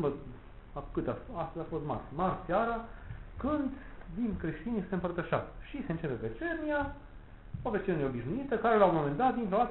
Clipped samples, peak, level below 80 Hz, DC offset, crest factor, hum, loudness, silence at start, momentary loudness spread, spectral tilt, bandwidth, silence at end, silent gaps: under 0.1%; -12 dBFS; -50 dBFS; under 0.1%; 22 dB; none; -33 LUFS; 0 s; 17 LU; -6.5 dB/octave; 4 kHz; 0 s; none